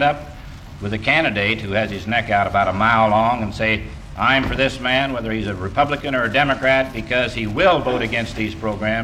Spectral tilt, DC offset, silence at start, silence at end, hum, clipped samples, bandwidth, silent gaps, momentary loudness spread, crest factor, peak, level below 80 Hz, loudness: -5.5 dB/octave; under 0.1%; 0 s; 0 s; none; under 0.1%; 14.5 kHz; none; 8 LU; 16 dB; -4 dBFS; -38 dBFS; -19 LUFS